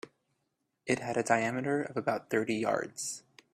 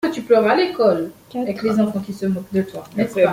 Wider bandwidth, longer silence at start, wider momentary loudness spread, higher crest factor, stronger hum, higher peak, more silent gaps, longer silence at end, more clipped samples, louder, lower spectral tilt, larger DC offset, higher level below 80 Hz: about the same, 15 kHz vs 16 kHz; about the same, 0.05 s vs 0.05 s; about the same, 11 LU vs 10 LU; first, 22 dB vs 16 dB; neither; second, -12 dBFS vs -2 dBFS; neither; first, 0.35 s vs 0 s; neither; second, -32 LUFS vs -20 LUFS; second, -4.5 dB/octave vs -6.5 dB/octave; neither; second, -74 dBFS vs -58 dBFS